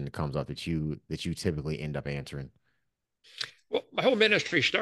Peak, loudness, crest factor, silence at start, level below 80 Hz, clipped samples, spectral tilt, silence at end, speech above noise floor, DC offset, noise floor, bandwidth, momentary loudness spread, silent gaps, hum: -10 dBFS; -30 LUFS; 22 dB; 0 s; -52 dBFS; under 0.1%; -5 dB/octave; 0 s; 51 dB; under 0.1%; -80 dBFS; 12.5 kHz; 15 LU; none; none